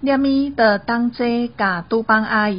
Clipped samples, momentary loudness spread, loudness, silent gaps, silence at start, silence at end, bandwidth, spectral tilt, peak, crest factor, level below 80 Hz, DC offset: under 0.1%; 5 LU; -18 LUFS; none; 0 s; 0 s; 5.4 kHz; -3.5 dB/octave; -2 dBFS; 16 dB; -48 dBFS; 0.2%